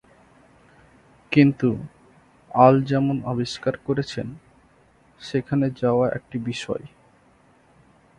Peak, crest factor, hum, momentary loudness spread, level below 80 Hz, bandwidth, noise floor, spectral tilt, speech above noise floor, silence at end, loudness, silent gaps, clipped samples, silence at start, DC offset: 0 dBFS; 24 dB; none; 16 LU; -56 dBFS; 10.5 kHz; -57 dBFS; -7.5 dB/octave; 36 dB; 1.3 s; -22 LUFS; none; under 0.1%; 1.3 s; under 0.1%